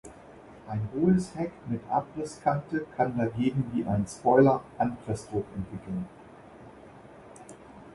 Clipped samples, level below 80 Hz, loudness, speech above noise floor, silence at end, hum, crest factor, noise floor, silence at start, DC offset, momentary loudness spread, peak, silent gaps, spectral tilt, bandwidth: under 0.1%; -56 dBFS; -29 LUFS; 22 dB; 0 s; none; 20 dB; -50 dBFS; 0.05 s; under 0.1%; 25 LU; -8 dBFS; none; -7.5 dB/octave; 11.5 kHz